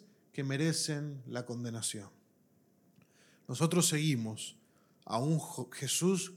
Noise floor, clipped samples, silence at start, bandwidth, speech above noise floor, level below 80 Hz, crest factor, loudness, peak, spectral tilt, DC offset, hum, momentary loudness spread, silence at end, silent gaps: -69 dBFS; under 0.1%; 0.35 s; 16 kHz; 35 dB; -88 dBFS; 20 dB; -34 LUFS; -16 dBFS; -4.5 dB/octave; under 0.1%; none; 15 LU; 0 s; none